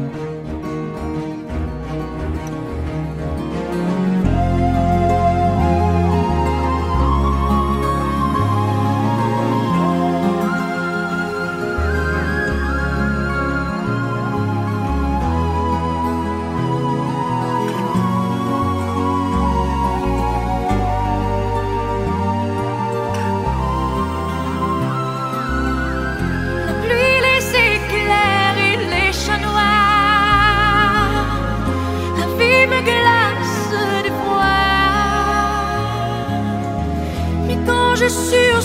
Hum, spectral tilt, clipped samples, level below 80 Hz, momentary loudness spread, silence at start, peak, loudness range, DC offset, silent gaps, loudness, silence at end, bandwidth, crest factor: none; -5.5 dB/octave; under 0.1%; -28 dBFS; 9 LU; 0 s; -2 dBFS; 6 LU; under 0.1%; none; -18 LUFS; 0 s; 16 kHz; 16 dB